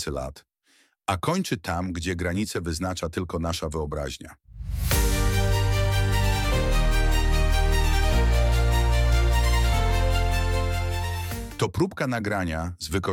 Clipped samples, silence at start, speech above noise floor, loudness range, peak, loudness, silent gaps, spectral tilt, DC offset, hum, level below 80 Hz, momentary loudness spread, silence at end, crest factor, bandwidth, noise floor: under 0.1%; 0 s; 36 dB; 6 LU; -10 dBFS; -25 LUFS; none; -5 dB/octave; under 0.1%; none; -26 dBFS; 8 LU; 0 s; 14 dB; 18 kHz; -63 dBFS